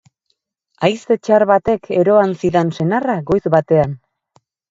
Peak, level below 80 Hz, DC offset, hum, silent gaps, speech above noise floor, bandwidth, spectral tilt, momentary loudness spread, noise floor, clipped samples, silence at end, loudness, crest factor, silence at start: 0 dBFS; -48 dBFS; under 0.1%; none; none; 55 dB; 7.8 kHz; -7.5 dB/octave; 6 LU; -69 dBFS; under 0.1%; 0.75 s; -16 LUFS; 16 dB; 0.8 s